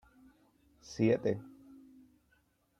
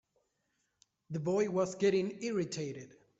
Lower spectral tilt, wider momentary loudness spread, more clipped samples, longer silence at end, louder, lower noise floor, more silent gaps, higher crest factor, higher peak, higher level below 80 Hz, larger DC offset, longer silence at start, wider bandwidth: first, -7 dB/octave vs -5.5 dB/octave; first, 27 LU vs 12 LU; neither; first, 1.3 s vs 0.3 s; about the same, -33 LUFS vs -34 LUFS; second, -73 dBFS vs -81 dBFS; neither; first, 22 dB vs 16 dB; first, -16 dBFS vs -20 dBFS; first, -70 dBFS vs -76 dBFS; neither; second, 0.9 s vs 1.1 s; first, 10.5 kHz vs 8 kHz